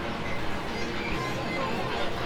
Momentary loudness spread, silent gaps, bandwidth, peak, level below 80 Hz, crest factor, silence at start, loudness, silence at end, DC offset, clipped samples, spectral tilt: 3 LU; none; 17 kHz; -16 dBFS; -44 dBFS; 12 dB; 0 s; -31 LUFS; 0 s; 1%; under 0.1%; -5 dB/octave